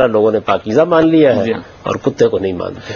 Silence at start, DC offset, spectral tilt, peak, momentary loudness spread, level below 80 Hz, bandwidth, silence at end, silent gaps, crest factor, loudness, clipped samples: 0 s; under 0.1%; -7 dB/octave; 0 dBFS; 11 LU; -48 dBFS; 7 kHz; 0 s; none; 14 dB; -14 LUFS; under 0.1%